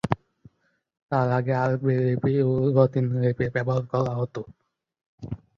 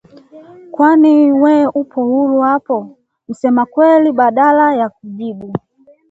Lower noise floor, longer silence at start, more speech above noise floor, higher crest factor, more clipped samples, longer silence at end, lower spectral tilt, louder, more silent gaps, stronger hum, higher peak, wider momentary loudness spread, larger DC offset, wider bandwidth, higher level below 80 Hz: first, -68 dBFS vs -39 dBFS; second, 0.05 s vs 0.35 s; first, 45 dB vs 27 dB; first, 22 dB vs 12 dB; neither; second, 0.2 s vs 0.5 s; first, -9.5 dB/octave vs -8 dB/octave; second, -24 LUFS vs -12 LUFS; first, 1.02-1.09 s, 5.06-5.18 s vs none; neither; about the same, -2 dBFS vs 0 dBFS; about the same, 16 LU vs 16 LU; neither; second, 6.8 kHz vs 7.8 kHz; first, -54 dBFS vs -62 dBFS